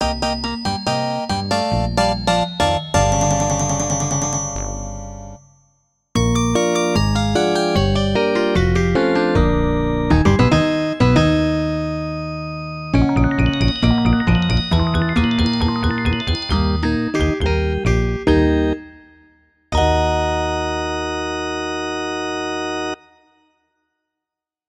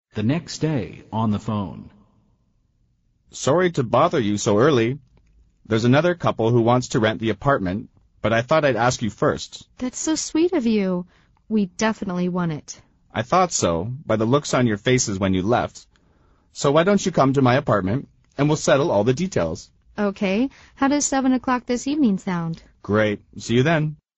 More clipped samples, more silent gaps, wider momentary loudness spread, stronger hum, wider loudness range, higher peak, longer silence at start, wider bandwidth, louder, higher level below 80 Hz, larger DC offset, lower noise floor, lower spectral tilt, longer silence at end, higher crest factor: neither; neither; second, 8 LU vs 12 LU; neither; about the same, 5 LU vs 4 LU; first, 0 dBFS vs -4 dBFS; second, 0 s vs 0.15 s; first, 13 kHz vs 8.2 kHz; first, -18 LUFS vs -21 LUFS; first, -28 dBFS vs -50 dBFS; neither; first, -86 dBFS vs -64 dBFS; about the same, -5 dB/octave vs -5.5 dB/octave; first, 1.75 s vs 0.2 s; about the same, 18 dB vs 18 dB